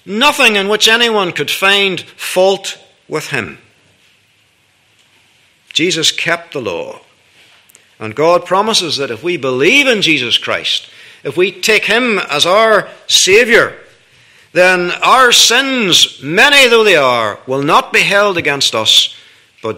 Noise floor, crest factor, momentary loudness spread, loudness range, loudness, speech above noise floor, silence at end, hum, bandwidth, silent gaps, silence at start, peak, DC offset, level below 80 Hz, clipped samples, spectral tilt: -54 dBFS; 12 dB; 13 LU; 10 LU; -10 LUFS; 42 dB; 0 s; none; over 20 kHz; none; 0.05 s; 0 dBFS; under 0.1%; -54 dBFS; 0.4%; -2 dB/octave